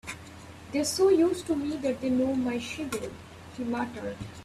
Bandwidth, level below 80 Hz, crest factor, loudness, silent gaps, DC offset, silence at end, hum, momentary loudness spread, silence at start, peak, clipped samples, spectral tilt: 14.5 kHz; -58 dBFS; 16 dB; -28 LUFS; none; under 0.1%; 0 s; none; 20 LU; 0.05 s; -12 dBFS; under 0.1%; -4.5 dB/octave